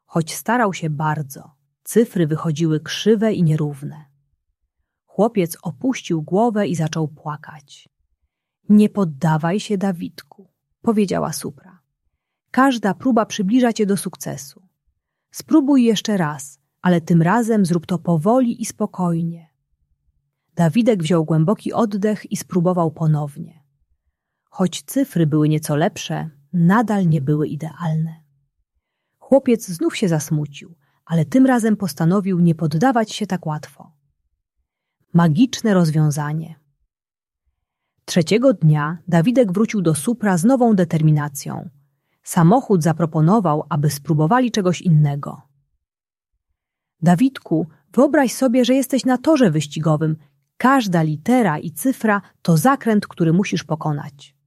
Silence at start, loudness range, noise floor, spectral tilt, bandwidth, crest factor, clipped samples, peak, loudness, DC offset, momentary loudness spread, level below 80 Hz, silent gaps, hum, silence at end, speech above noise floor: 0.15 s; 5 LU; under -90 dBFS; -6.5 dB/octave; 14.5 kHz; 16 dB; under 0.1%; -2 dBFS; -18 LUFS; under 0.1%; 12 LU; -62 dBFS; none; none; 0.35 s; over 72 dB